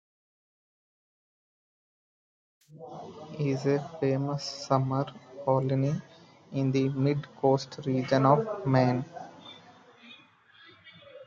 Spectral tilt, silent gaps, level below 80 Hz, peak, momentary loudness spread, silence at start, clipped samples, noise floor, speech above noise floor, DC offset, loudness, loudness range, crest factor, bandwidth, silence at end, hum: -7.5 dB/octave; none; -70 dBFS; -8 dBFS; 19 LU; 2.75 s; under 0.1%; -58 dBFS; 30 dB; under 0.1%; -28 LUFS; 7 LU; 22 dB; 7.6 kHz; 0 s; none